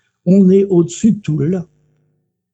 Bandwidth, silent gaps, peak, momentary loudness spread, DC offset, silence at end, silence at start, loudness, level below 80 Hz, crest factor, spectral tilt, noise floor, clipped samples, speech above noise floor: 8.4 kHz; none; -2 dBFS; 9 LU; under 0.1%; 0.9 s; 0.25 s; -13 LUFS; -54 dBFS; 14 dB; -8.5 dB/octave; -65 dBFS; under 0.1%; 53 dB